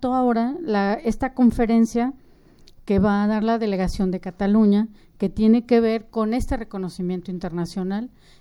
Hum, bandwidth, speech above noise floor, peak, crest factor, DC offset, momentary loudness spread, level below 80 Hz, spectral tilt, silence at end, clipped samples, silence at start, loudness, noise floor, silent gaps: none; 12 kHz; 29 dB; -6 dBFS; 16 dB; under 0.1%; 11 LU; -38 dBFS; -7.5 dB/octave; 0.35 s; under 0.1%; 0 s; -22 LUFS; -50 dBFS; none